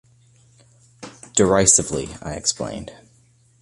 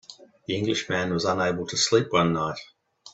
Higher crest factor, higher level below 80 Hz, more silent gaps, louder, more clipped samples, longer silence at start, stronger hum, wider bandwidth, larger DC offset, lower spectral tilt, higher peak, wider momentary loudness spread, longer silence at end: about the same, 22 dB vs 20 dB; first, -46 dBFS vs -60 dBFS; neither; first, -18 LUFS vs -24 LUFS; neither; first, 1 s vs 0.1 s; neither; first, 11.5 kHz vs 8.4 kHz; neither; about the same, -3 dB/octave vs -4 dB/octave; first, -2 dBFS vs -6 dBFS; first, 26 LU vs 10 LU; first, 0.65 s vs 0.05 s